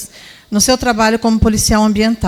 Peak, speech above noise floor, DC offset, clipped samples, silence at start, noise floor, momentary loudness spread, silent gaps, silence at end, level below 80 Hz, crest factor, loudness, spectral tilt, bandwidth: 0 dBFS; 23 dB; under 0.1%; under 0.1%; 0 s; -35 dBFS; 4 LU; none; 0 s; -26 dBFS; 14 dB; -13 LUFS; -4 dB/octave; 16 kHz